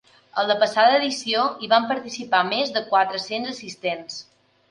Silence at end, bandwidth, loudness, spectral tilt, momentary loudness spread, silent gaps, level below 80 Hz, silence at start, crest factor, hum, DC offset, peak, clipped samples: 0.5 s; 11 kHz; -22 LUFS; -2.5 dB/octave; 13 LU; none; -72 dBFS; 0.35 s; 20 dB; none; under 0.1%; -4 dBFS; under 0.1%